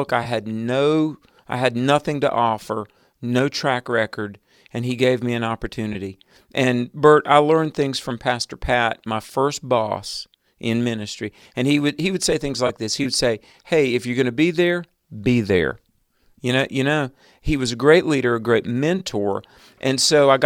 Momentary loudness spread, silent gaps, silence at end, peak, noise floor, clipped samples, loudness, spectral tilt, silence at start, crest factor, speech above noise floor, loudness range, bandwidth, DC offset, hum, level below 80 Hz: 14 LU; none; 0 s; -2 dBFS; -61 dBFS; under 0.1%; -20 LUFS; -5 dB/octave; 0 s; 20 dB; 41 dB; 4 LU; 16.5 kHz; under 0.1%; none; -46 dBFS